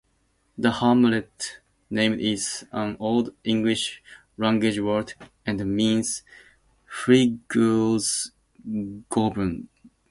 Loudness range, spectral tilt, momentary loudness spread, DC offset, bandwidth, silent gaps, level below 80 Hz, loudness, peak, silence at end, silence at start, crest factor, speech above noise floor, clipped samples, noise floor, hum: 2 LU; -4.5 dB/octave; 14 LU; under 0.1%; 11.5 kHz; none; -54 dBFS; -24 LUFS; -4 dBFS; 0.45 s; 0.6 s; 20 dB; 44 dB; under 0.1%; -68 dBFS; none